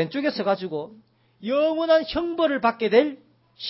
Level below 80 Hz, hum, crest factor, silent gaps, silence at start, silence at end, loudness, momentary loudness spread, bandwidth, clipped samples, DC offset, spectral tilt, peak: -56 dBFS; none; 18 dB; none; 0 s; 0 s; -23 LUFS; 12 LU; 5.8 kHz; under 0.1%; under 0.1%; -9 dB/octave; -4 dBFS